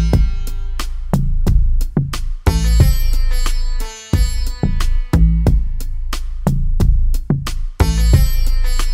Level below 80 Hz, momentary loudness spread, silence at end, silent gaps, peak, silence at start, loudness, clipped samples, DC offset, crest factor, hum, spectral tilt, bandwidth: -14 dBFS; 12 LU; 0 s; none; 0 dBFS; 0 s; -19 LUFS; under 0.1%; under 0.1%; 14 dB; none; -6 dB/octave; 15.5 kHz